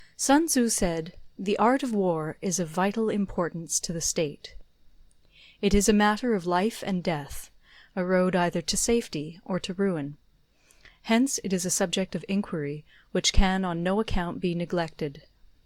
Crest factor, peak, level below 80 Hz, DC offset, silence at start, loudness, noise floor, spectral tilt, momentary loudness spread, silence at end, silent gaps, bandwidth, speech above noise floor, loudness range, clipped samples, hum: 22 dB; -6 dBFS; -38 dBFS; under 0.1%; 0 s; -27 LUFS; -62 dBFS; -4 dB/octave; 12 LU; 0.45 s; none; 17 kHz; 36 dB; 3 LU; under 0.1%; none